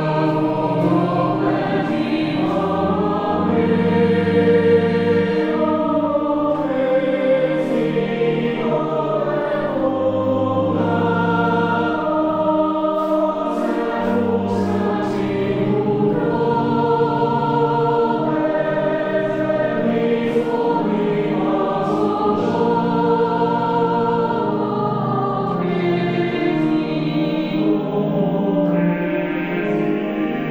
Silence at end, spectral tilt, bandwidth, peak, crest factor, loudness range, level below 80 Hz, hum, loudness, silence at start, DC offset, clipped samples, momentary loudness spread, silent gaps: 0 s; -8.5 dB/octave; 8.4 kHz; -4 dBFS; 14 dB; 3 LU; -52 dBFS; none; -19 LUFS; 0 s; 0.2%; under 0.1%; 3 LU; none